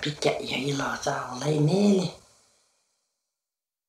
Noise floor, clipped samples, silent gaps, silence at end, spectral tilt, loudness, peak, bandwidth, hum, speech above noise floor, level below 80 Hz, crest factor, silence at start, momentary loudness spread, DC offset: under -90 dBFS; under 0.1%; none; 1.7 s; -5.5 dB/octave; -26 LUFS; -10 dBFS; 14 kHz; none; over 65 dB; -62 dBFS; 18 dB; 0 s; 8 LU; under 0.1%